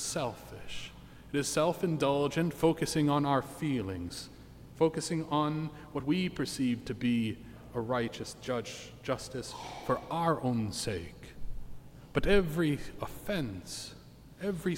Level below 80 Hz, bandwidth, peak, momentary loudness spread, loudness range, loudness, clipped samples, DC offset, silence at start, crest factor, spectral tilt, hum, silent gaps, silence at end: -50 dBFS; 16.5 kHz; -14 dBFS; 18 LU; 5 LU; -33 LUFS; under 0.1%; under 0.1%; 0 s; 20 dB; -5.5 dB/octave; none; none; 0 s